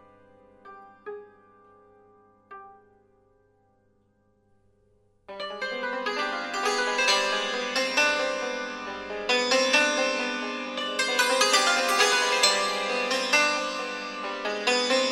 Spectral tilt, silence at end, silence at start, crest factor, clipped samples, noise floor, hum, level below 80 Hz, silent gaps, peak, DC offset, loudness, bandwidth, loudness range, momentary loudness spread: 0 dB/octave; 0 s; 0.65 s; 22 dB; under 0.1%; -66 dBFS; 50 Hz at -75 dBFS; -70 dBFS; none; -6 dBFS; under 0.1%; -24 LUFS; 16 kHz; 12 LU; 13 LU